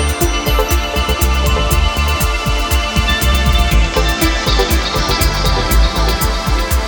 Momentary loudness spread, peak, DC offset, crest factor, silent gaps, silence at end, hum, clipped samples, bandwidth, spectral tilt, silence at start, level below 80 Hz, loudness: 2 LU; 0 dBFS; under 0.1%; 12 dB; none; 0 s; none; under 0.1%; 19.5 kHz; -4 dB/octave; 0 s; -16 dBFS; -14 LUFS